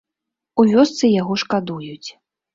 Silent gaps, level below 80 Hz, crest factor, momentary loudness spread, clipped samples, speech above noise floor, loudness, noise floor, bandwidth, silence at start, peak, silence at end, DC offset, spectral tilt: none; -58 dBFS; 16 dB; 19 LU; under 0.1%; 66 dB; -17 LUFS; -83 dBFS; 7.6 kHz; 0.55 s; -2 dBFS; 0.45 s; under 0.1%; -5.5 dB/octave